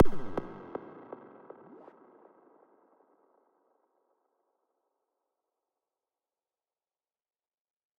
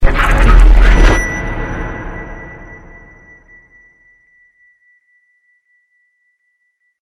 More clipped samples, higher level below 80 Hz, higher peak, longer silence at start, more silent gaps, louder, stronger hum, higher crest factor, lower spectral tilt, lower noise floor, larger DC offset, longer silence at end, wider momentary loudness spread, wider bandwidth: second, under 0.1% vs 1%; second, -54 dBFS vs -14 dBFS; second, -8 dBFS vs 0 dBFS; about the same, 0 s vs 0 s; neither; second, -39 LUFS vs -13 LUFS; neither; first, 26 dB vs 14 dB; first, -9 dB/octave vs -5.5 dB/octave; first, under -90 dBFS vs -64 dBFS; neither; first, 7.25 s vs 4.3 s; second, 20 LU vs 23 LU; second, 4.5 kHz vs 10.5 kHz